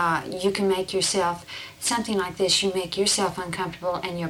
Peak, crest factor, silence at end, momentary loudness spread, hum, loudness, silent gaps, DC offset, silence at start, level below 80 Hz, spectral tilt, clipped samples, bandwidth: -8 dBFS; 18 dB; 0 s; 8 LU; none; -24 LUFS; none; under 0.1%; 0 s; -56 dBFS; -3 dB/octave; under 0.1%; 16.5 kHz